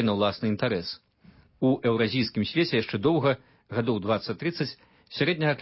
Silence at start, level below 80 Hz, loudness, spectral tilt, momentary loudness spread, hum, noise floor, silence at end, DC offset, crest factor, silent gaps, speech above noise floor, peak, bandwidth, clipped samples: 0 s; -58 dBFS; -27 LUFS; -10 dB/octave; 9 LU; none; -57 dBFS; 0 s; under 0.1%; 16 dB; none; 31 dB; -10 dBFS; 5.8 kHz; under 0.1%